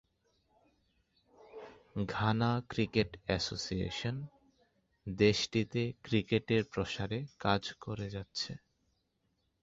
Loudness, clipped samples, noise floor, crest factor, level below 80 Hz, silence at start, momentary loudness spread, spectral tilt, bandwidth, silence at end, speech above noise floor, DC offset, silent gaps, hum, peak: -34 LUFS; under 0.1%; -79 dBFS; 22 dB; -58 dBFS; 1.45 s; 15 LU; -5.5 dB/octave; 7.8 kHz; 1.05 s; 45 dB; under 0.1%; none; none; -14 dBFS